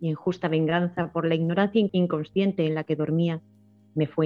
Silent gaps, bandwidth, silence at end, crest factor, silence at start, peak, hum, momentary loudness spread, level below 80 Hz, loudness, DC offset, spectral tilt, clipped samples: none; 6.4 kHz; 0 s; 18 dB; 0 s; -8 dBFS; none; 5 LU; -64 dBFS; -25 LUFS; under 0.1%; -9 dB/octave; under 0.1%